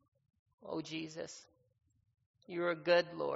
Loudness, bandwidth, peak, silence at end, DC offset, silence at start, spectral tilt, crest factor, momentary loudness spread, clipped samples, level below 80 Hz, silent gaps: -37 LUFS; 7.6 kHz; -16 dBFS; 0 s; under 0.1%; 0.6 s; -3 dB/octave; 22 dB; 18 LU; under 0.1%; -82 dBFS; 2.26-2.34 s